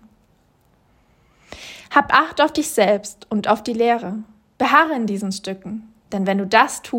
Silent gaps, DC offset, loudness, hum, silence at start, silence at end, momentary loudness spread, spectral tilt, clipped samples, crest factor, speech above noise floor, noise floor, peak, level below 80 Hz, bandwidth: none; under 0.1%; -18 LUFS; none; 1.5 s; 0 s; 18 LU; -4 dB/octave; under 0.1%; 20 dB; 40 dB; -59 dBFS; 0 dBFS; -58 dBFS; 16.5 kHz